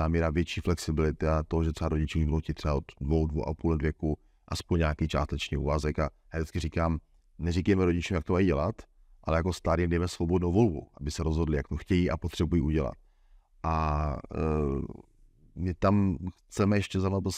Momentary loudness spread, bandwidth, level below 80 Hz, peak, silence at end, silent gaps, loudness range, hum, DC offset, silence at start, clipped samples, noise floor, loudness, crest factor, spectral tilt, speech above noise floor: 10 LU; 12.5 kHz; -40 dBFS; -12 dBFS; 0 s; none; 3 LU; none; under 0.1%; 0 s; under 0.1%; -60 dBFS; -30 LUFS; 16 dB; -7 dB/octave; 32 dB